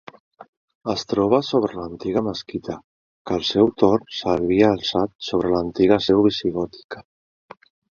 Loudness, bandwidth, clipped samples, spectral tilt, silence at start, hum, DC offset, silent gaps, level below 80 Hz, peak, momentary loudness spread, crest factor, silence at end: -21 LUFS; 7.2 kHz; under 0.1%; -6 dB/octave; 0.4 s; none; under 0.1%; 0.48-0.68 s, 0.75-0.81 s, 2.84-3.25 s, 5.15-5.19 s, 6.84-6.89 s; -50 dBFS; -2 dBFS; 15 LU; 20 dB; 0.95 s